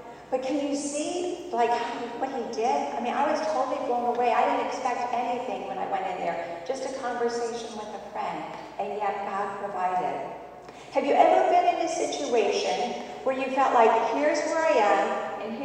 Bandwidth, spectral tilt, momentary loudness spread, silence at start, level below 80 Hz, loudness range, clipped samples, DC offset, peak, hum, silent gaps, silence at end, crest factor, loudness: 10 kHz; -3.5 dB/octave; 12 LU; 0 s; -66 dBFS; 7 LU; under 0.1%; under 0.1%; -6 dBFS; none; none; 0 s; 20 dB; -27 LUFS